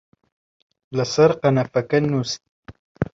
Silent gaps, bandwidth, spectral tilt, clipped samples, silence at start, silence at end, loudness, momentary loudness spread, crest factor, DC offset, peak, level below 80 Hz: 2.49-2.63 s, 2.79-2.95 s; 7.8 kHz; -6 dB/octave; under 0.1%; 0.9 s; 0.1 s; -20 LUFS; 13 LU; 20 dB; under 0.1%; -2 dBFS; -54 dBFS